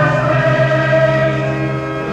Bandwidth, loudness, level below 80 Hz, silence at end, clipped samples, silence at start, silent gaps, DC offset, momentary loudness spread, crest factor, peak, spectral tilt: 8.4 kHz; -14 LUFS; -40 dBFS; 0 s; under 0.1%; 0 s; none; under 0.1%; 7 LU; 12 dB; -2 dBFS; -7.5 dB/octave